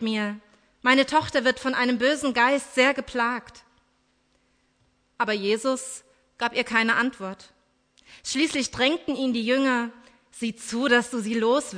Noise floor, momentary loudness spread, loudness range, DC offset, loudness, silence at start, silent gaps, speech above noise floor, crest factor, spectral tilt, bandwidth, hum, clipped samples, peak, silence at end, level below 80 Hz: -68 dBFS; 12 LU; 6 LU; under 0.1%; -24 LUFS; 0 s; none; 43 dB; 20 dB; -3 dB/octave; 11 kHz; none; under 0.1%; -6 dBFS; 0 s; -62 dBFS